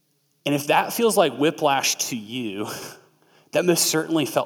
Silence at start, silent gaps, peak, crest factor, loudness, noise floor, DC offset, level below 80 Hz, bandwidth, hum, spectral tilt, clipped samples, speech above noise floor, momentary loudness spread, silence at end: 0.45 s; none; -4 dBFS; 18 dB; -22 LUFS; -58 dBFS; under 0.1%; -74 dBFS; 18.5 kHz; none; -3 dB/octave; under 0.1%; 36 dB; 12 LU; 0 s